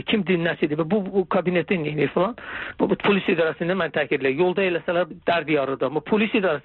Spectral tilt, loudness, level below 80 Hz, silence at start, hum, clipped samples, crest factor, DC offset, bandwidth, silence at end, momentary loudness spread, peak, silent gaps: -4.5 dB/octave; -22 LUFS; -58 dBFS; 0.05 s; none; under 0.1%; 14 dB; under 0.1%; 4.3 kHz; 0.05 s; 4 LU; -8 dBFS; none